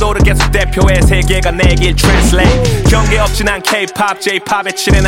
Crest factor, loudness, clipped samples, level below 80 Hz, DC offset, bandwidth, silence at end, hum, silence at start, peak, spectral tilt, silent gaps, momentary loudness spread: 10 dB; -11 LUFS; under 0.1%; -14 dBFS; under 0.1%; 16.5 kHz; 0 s; none; 0 s; 0 dBFS; -4.5 dB/octave; none; 5 LU